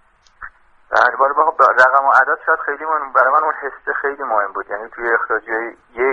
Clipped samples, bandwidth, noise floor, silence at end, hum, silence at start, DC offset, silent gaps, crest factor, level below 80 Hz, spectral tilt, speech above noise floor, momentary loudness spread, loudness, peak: under 0.1%; 9.2 kHz; -39 dBFS; 0 s; none; 0.4 s; under 0.1%; none; 16 dB; -56 dBFS; -3.5 dB/octave; 23 dB; 12 LU; -16 LUFS; 0 dBFS